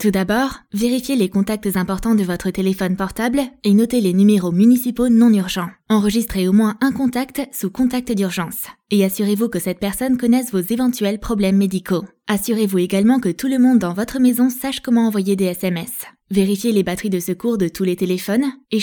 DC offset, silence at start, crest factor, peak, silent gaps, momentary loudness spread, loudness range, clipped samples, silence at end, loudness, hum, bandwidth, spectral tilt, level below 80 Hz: under 0.1%; 0 s; 14 dB; -4 dBFS; none; 8 LU; 4 LU; under 0.1%; 0 s; -18 LUFS; none; 19 kHz; -6 dB/octave; -44 dBFS